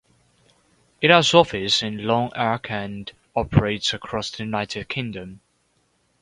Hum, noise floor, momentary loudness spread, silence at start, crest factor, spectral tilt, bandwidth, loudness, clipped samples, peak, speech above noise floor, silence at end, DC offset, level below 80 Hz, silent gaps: none; -66 dBFS; 15 LU; 1 s; 24 dB; -4.5 dB/octave; 11 kHz; -21 LUFS; under 0.1%; 0 dBFS; 45 dB; 0.85 s; under 0.1%; -46 dBFS; none